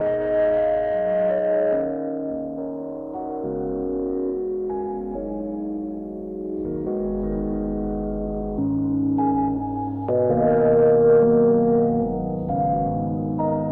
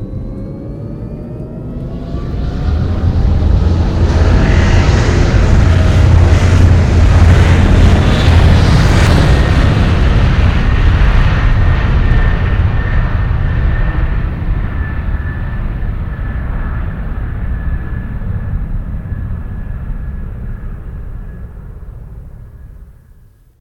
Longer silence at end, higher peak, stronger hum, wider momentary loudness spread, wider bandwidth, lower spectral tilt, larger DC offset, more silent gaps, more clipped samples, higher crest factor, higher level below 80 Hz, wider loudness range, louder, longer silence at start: second, 0 s vs 0.7 s; second, -8 dBFS vs 0 dBFS; neither; second, 13 LU vs 16 LU; second, 3.4 kHz vs 9.4 kHz; first, -12 dB/octave vs -7 dB/octave; neither; neither; second, under 0.1% vs 0.2%; about the same, 14 dB vs 12 dB; second, -42 dBFS vs -14 dBFS; second, 9 LU vs 15 LU; second, -23 LUFS vs -13 LUFS; about the same, 0 s vs 0 s